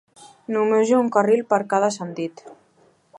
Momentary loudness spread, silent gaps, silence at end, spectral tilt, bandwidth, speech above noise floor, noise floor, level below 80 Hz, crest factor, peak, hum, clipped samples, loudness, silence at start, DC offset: 13 LU; none; 0.65 s; -5.5 dB/octave; 11 kHz; 39 dB; -59 dBFS; -76 dBFS; 18 dB; -4 dBFS; none; under 0.1%; -20 LUFS; 0.2 s; under 0.1%